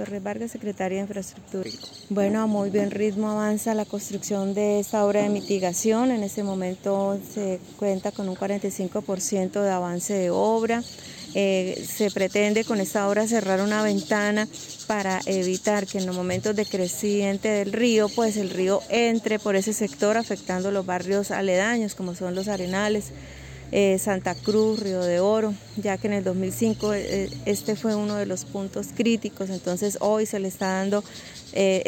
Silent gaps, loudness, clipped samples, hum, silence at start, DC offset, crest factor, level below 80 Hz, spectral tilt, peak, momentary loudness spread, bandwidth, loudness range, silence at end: none; -25 LUFS; under 0.1%; none; 0 s; under 0.1%; 14 dB; -56 dBFS; -4.5 dB/octave; -10 dBFS; 8 LU; 17 kHz; 3 LU; 0 s